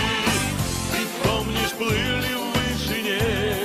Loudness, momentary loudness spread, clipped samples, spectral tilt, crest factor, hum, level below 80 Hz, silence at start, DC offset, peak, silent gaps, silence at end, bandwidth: -23 LUFS; 3 LU; under 0.1%; -4 dB/octave; 16 dB; none; -36 dBFS; 0 s; under 0.1%; -8 dBFS; none; 0 s; 16 kHz